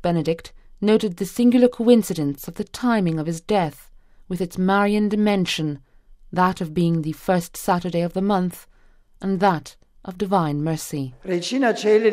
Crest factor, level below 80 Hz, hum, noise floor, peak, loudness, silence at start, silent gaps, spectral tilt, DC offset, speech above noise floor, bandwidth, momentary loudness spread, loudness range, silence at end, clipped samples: 18 dB; -50 dBFS; none; -52 dBFS; -4 dBFS; -21 LUFS; 0.05 s; none; -6 dB/octave; under 0.1%; 32 dB; 16 kHz; 12 LU; 4 LU; 0 s; under 0.1%